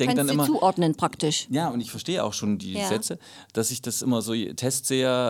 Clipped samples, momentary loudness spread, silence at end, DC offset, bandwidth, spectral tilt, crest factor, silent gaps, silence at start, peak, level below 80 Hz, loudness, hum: under 0.1%; 7 LU; 0 s; under 0.1%; 19 kHz; -4 dB/octave; 18 dB; none; 0 s; -8 dBFS; -66 dBFS; -25 LUFS; none